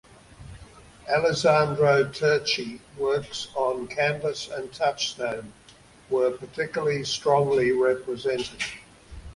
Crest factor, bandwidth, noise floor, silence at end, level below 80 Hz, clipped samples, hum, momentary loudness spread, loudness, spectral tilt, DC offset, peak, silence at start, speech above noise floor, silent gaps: 18 dB; 11.5 kHz; -52 dBFS; 0 s; -54 dBFS; under 0.1%; none; 12 LU; -25 LUFS; -4.5 dB/octave; under 0.1%; -8 dBFS; 0.4 s; 28 dB; none